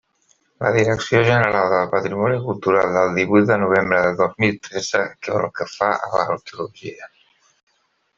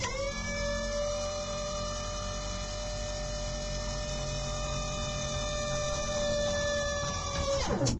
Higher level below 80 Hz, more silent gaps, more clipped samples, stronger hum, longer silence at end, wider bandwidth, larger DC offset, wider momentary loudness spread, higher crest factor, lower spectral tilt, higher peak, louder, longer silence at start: second, -56 dBFS vs -40 dBFS; neither; neither; neither; first, 1.1 s vs 0 s; second, 7.6 kHz vs 11 kHz; neither; first, 10 LU vs 6 LU; about the same, 18 dB vs 16 dB; first, -6 dB/octave vs -3.5 dB/octave; first, 0 dBFS vs -18 dBFS; first, -19 LUFS vs -33 LUFS; first, 0.6 s vs 0 s